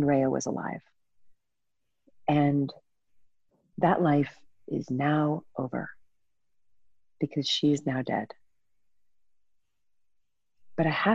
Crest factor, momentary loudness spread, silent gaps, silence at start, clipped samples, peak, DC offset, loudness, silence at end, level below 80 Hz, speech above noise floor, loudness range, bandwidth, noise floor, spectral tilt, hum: 20 dB; 12 LU; none; 0 s; under 0.1%; -10 dBFS; under 0.1%; -28 LUFS; 0 s; -68 dBFS; 59 dB; 4 LU; 8 kHz; -86 dBFS; -6 dB/octave; none